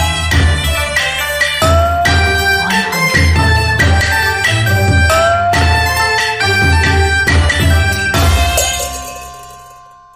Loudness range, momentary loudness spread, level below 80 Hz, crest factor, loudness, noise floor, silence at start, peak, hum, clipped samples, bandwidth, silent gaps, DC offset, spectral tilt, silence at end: 1 LU; 3 LU; -20 dBFS; 12 dB; -11 LUFS; -38 dBFS; 0 s; 0 dBFS; none; under 0.1%; 15.5 kHz; none; under 0.1%; -4 dB/octave; 0.35 s